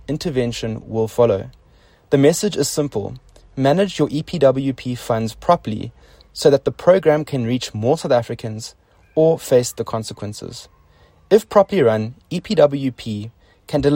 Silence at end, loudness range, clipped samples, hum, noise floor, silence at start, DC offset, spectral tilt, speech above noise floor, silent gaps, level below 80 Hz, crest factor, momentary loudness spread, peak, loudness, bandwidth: 0 s; 2 LU; under 0.1%; none; -52 dBFS; 0.1 s; under 0.1%; -5.5 dB/octave; 34 dB; none; -48 dBFS; 18 dB; 15 LU; 0 dBFS; -18 LUFS; 16.5 kHz